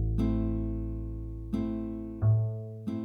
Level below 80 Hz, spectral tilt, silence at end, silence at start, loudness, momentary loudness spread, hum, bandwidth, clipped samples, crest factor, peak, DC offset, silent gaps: -38 dBFS; -10.5 dB/octave; 0 s; 0 s; -32 LUFS; 11 LU; none; 4.9 kHz; under 0.1%; 14 dB; -16 dBFS; under 0.1%; none